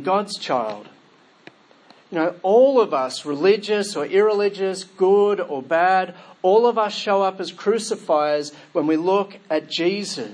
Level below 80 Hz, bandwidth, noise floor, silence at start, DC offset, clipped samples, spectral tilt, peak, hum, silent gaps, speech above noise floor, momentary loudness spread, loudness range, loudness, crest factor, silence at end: -80 dBFS; 10.5 kHz; -54 dBFS; 0 s; under 0.1%; under 0.1%; -4.5 dB/octave; -4 dBFS; none; none; 34 dB; 9 LU; 3 LU; -20 LUFS; 16 dB; 0 s